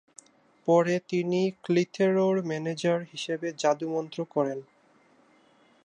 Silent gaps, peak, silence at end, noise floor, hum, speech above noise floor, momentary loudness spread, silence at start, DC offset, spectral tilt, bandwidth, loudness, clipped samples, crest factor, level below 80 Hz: none; -10 dBFS; 1.25 s; -62 dBFS; none; 35 dB; 9 LU; 0.65 s; under 0.1%; -6 dB/octave; 10 kHz; -27 LUFS; under 0.1%; 18 dB; -78 dBFS